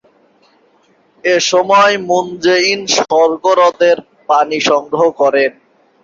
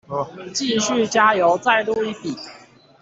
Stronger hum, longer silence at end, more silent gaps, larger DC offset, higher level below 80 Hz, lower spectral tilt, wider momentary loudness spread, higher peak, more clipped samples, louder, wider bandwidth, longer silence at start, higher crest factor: neither; about the same, 0.55 s vs 0.45 s; neither; neither; about the same, -60 dBFS vs -62 dBFS; about the same, -2.5 dB/octave vs -3 dB/octave; second, 5 LU vs 14 LU; about the same, 0 dBFS vs -2 dBFS; neither; first, -12 LUFS vs -19 LUFS; about the same, 7.6 kHz vs 8 kHz; first, 1.25 s vs 0.1 s; about the same, 14 dB vs 18 dB